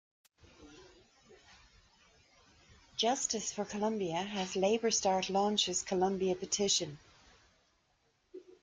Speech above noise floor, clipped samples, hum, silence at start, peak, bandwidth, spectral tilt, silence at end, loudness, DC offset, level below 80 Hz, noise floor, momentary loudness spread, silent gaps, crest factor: 42 dB; under 0.1%; none; 0.6 s; -18 dBFS; 10 kHz; -3 dB/octave; 0.2 s; -33 LUFS; under 0.1%; -70 dBFS; -75 dBFS; 11 LU; none; 18 dB